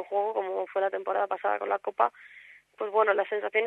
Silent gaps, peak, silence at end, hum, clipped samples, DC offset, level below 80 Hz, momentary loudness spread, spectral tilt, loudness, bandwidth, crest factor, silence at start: none; -8 dBFS; 0 s; none; under 0.1%; under 0.1%; -86 dBFS; 6 LU; -5 dB/octave; -28 LUFS; 4.1 kHz; 20 dB; 0 s